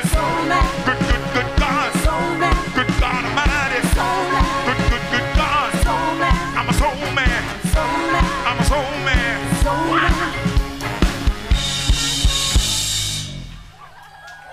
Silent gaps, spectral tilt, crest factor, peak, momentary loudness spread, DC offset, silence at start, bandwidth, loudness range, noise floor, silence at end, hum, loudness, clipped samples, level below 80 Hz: none; -4 dB/octave; 18 dB; 0 dBFS; 4 LU; under 0.1%; 0 s; 16 kHz; 1 LU; -41 dBFS; 0 s; none; -18 LUFS; under 0.1%; -24 dBFS